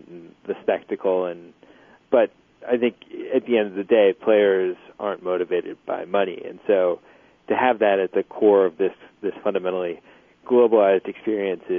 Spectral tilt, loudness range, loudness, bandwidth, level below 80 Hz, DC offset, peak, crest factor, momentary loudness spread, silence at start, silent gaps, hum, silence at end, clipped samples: -8 dB/octave; 3 LU; -22 LUFS; 3.6 kHz; -72 dBFS; under 0.1%; -6 dBFS; 16 dB; 13 LU; 0.1 s; none; none; 0 s; under 0.1%